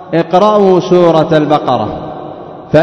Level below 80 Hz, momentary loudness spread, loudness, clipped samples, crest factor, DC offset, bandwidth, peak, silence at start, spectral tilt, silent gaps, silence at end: -42 dBFS; 18 LU; -10 LUFS; 2%; 10 dB; under 0.1%; 7.6 kHz; 0 dBFS; 0 s; -7.5 dB/octave; none; 0 s